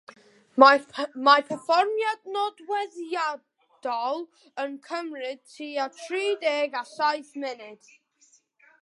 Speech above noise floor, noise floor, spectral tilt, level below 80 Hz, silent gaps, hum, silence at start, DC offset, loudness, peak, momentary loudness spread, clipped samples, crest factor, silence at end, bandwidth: 37 dB; -63 dBFS; -2.5 dB/octave; -86 dBFS; none; none; 0.55 s; under 0.1%; -25 LUFS; -2 dBFS; 16 LU; under 0.1%; 26 dB; 1.1 s; 11.5 kHz